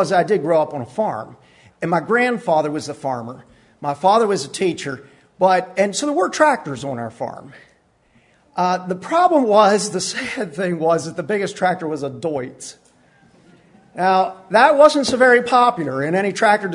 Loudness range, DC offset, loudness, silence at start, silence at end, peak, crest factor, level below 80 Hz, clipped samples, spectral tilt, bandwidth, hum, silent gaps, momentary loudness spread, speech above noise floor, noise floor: 7 LU; under 0.1%; -18 LUFS; 0 s; 0 s; 0 dBFS; 18 dB; -64 dBFS; under 0.1%; -4.5 dB/octave; 11 kHz; none; none; 15 LU; 40 dB; -57 dBFS